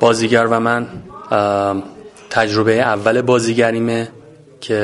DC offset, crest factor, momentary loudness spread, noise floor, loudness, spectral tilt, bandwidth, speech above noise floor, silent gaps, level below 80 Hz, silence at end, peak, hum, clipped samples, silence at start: under 0.1%; 16 dB; 15 LU; -38 dBFS; -16 LUFS; -5 dB/octave; 11.5 kHz; 23 dB; none; -52 dBFS; 0 s; 0 dBFS; none; under 0.1%; 0 s